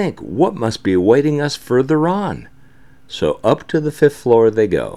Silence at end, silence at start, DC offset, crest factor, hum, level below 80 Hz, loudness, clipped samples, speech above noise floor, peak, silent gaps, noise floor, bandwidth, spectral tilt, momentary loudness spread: 0 s; 0 s; 0.7%; 16 dB; none; -48 dBFS; -16 LUFS; under 0.1%; 33 dB; 0 dBFS; none; -48 dBFS; 13 kHz; -6.5 dB/octave; 8 LU